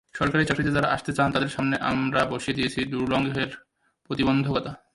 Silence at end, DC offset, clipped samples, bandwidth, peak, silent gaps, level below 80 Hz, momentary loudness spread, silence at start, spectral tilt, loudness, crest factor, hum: 0.2 s; under 0.1%; under 0.1%; 11.5 kHz; -8 dBFS; none; -50 dBFS; 6 LU; 0.15 s; -6 dB/octave; -25 LUFS; 16 dB; none